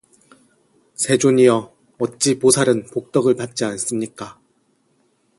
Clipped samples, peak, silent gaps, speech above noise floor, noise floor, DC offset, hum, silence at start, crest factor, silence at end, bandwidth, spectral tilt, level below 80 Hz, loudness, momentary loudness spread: under 0.1%; 0 dBFS; none; 45 dB; -63 dBFS; under 0.1%; none; 1 s; 20 dB; 1.05 s; 12 kHz; -4.5 dB/octave; -60 dBFS; -18 LUFS; 14 LU